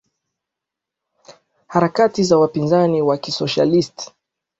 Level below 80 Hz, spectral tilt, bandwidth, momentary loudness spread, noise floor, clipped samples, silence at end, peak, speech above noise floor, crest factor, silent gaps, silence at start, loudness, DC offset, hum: -58 dBFS; -6 dB/octave; 8 kHz; 9 LU; -84 dBFS; under 0.1%; 0.55 s; -2 dBFS; 68 dB; 16 dB; none; 1.3 s; -17 LUFS; under 0.1%; none